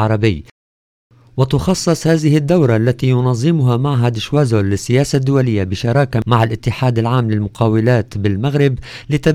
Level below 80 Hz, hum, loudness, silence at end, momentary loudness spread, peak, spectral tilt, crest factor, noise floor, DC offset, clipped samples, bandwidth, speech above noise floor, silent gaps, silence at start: -40 dBFS; none; -15 LUFS; 0 s; 5 LU; -2 dBFS; -7 dB/octave; 12 dB; under -90 dBFS; under 0.1%; under 0.1%; 14 kHz; over 76 dB; 0.51-1.10 s; 0 s